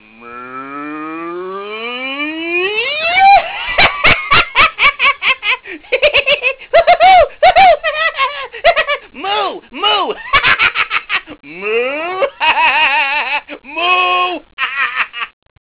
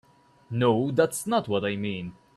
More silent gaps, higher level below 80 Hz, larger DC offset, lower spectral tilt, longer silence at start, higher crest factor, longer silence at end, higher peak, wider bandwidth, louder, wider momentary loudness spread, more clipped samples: first, 14.53-14.57 s vs none; first, -40 dBFS vs -64 dBFS; neither; about the same, -6 dB/octave vs -5.5 dB/octave; second, 0.2 s vs 0.5 s; second, 10 dB vs 18 dB; first, 0.4 s vs 0.25 s; first, -4 dBFS vs -8 dBFS; second, 4 kHz vs 13.5 kHz; first, -12 LUFS vs -26 LUFS; first, 16 LU vs 10 LU; neither